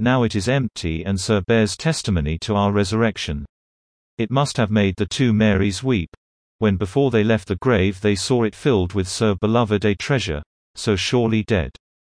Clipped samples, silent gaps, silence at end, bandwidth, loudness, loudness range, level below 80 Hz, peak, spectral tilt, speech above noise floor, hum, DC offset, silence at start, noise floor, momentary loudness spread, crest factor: under 0.1%; 3.49-4.17 s, 6.08-6.59 s, 10.46-10.74 s; 0.4 s; 10.5 kHz; -20 LUFS; 2 LU; -40 dBFS; -4 dBFS; -5.5 dB/octave; over 71 dB; none; under 0.1%; 0 s; under -90 dBFS; 8 LU; 16 dB